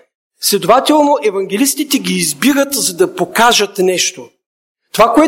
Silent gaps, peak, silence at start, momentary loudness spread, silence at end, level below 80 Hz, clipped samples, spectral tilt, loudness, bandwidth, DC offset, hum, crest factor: 4.46-4.75 s; 0 dBFS; 0.4 s; 6 LU; 0 s; -48 dBFS; under 0.1%; -3 dB/octave; -12 LUFS; 17 kHz; under 0.1%; none; 14 dB